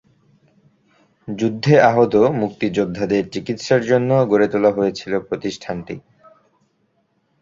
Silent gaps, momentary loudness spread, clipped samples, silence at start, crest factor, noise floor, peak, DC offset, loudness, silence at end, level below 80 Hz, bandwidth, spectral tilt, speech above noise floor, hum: none; 15 LU; under 0.1%; 1.25 s; 18 dB; -65 dBFS; -2 dBFS; under 0.1%; -18 LUFS; 1.4 s; -54 dBFS; 7.6 kHz; -6.5 dB/octave; 48 dB; none